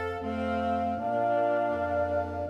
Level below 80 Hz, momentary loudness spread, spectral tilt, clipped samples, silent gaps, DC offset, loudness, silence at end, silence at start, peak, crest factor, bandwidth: -52 dBFS; 4 LU; -8 dB/octave; under 0.1%; none; under 0.1%; -29 LUFS; 0 s; 0 s; -18 dBFS; 12 dB; 9 kHz